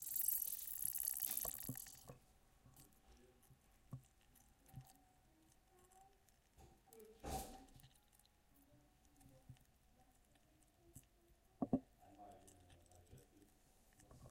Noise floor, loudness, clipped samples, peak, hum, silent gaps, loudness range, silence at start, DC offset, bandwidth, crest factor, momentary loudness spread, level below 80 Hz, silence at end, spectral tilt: -74 dBFS; -44 LUFS; under 0.1%; -24 dBFS; none; none; 21 LU; 0 s; under 0.1%; 17 kHz; 28 dB; 27 LU; -70 dBFS; 0 s; -3.5 dB/octave